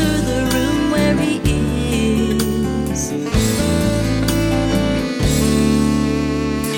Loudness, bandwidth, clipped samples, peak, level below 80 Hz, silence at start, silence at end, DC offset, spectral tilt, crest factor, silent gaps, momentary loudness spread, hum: -17 LUFS; 17.5 kHz; under 0.1%; -4 dBFS; -26 dBFS; 0 s; 0 s; under 0.1%; -5.5 dB/octave; 14 dB; none; 4 LU; none